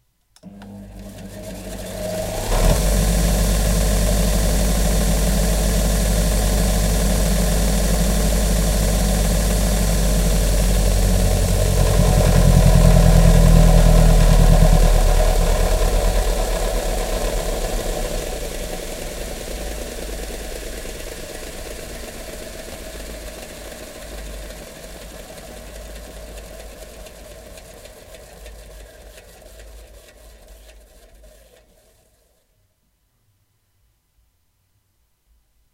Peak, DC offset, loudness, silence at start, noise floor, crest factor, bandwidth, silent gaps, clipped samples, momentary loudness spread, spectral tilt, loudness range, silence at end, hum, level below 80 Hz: 0 dBFS; under 0.1%; -19 LUFS; 0.45 s; -65 dBFS; 18 dB; 16 kHz; none; under 0.1%; 23 LU; -5 dB/octave; 22 LU; 5.2 s; none; -20 dBFS